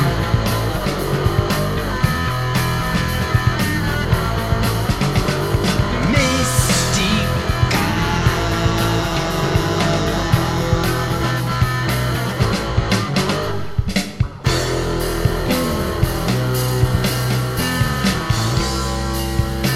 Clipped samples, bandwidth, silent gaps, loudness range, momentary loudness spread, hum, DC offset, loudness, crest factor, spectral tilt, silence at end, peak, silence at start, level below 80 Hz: under 0.1%; 16 kHz; none; 3 LU; 4 LU; none; 0.4%; -18 LUFS; 16 dB; -5 dB/octave; 0 s; -2 dBFS; 0 s; -28 dBFS